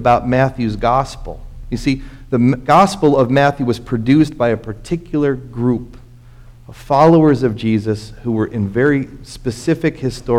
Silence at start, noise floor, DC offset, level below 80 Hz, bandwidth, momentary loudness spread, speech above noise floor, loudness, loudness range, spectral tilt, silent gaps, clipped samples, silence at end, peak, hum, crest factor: 0 s; -40 dBFS; under 0.1%; -36 dBFS; 14 kHz; 12 LU; 24 dB; -16 LUFS; 3 LU; -7 dB/octave; none; under 0.1%; 0 s; 0 dBFS; none; 14 dB